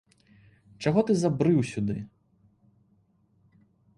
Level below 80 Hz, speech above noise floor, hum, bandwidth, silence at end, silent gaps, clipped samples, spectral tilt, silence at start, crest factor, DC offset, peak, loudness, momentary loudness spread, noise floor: -60 dBFS; 42 dB; none; 11.5 kHz; 1.9 s; none; under 0.1%; -7.5 dB/octave; 0.8 s; 18 dB; under 0.1%; -10 dBFS; -26 LUFS; 11 LU; -66 dBFS